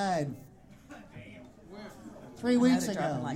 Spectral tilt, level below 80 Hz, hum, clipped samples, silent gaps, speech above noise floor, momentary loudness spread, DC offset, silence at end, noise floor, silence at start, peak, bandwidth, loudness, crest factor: -5.5 dB/octave; -64 dBFS; none; under 0.1%; none; 23 dB; 25 LU; under 0.1%; 0 s; -52 dBFS; 0 s; -14 dBFS; 14.5 kHz; -29 LUFS; 18 dB